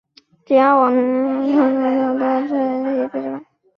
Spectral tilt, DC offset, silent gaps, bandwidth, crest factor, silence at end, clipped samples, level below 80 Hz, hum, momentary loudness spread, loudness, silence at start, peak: -7.5 dB/octave; under 0.1%; none; 5.6 kHz; 16 dB; 0.35 s; under 0.1%; -66 dBFS; none; 10 LU; -17 LUFS; 0.5 s; -2 dBFS